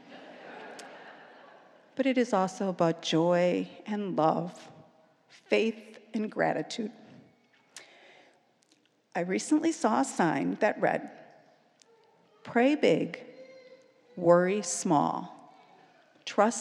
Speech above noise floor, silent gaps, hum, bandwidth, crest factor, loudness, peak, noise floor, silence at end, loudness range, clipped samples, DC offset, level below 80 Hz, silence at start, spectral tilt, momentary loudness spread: 40 dB; none; none; 12 kHz; 22 dB; -28 LUFS; -8 dBFS; -68 dBFS; 0 s; 5 LU; under 0.1%; under 0.1%; -88 dBFS; 0.1 s; -5 dB/octave; 23 LU